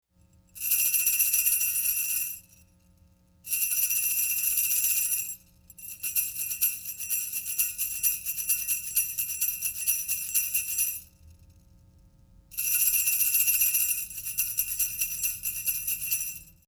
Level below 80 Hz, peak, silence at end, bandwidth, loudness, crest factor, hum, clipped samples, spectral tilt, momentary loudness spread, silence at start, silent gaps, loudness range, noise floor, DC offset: -60 dBFS; -8 dBFS; 0.25 s; over 20 kHz; -25 LUFS; 20 dB; none; under 0.1%; 2.5 dB/octave; 9 LU; 0.55 s; none; 4 LU; -61 dBFS; under 0.1%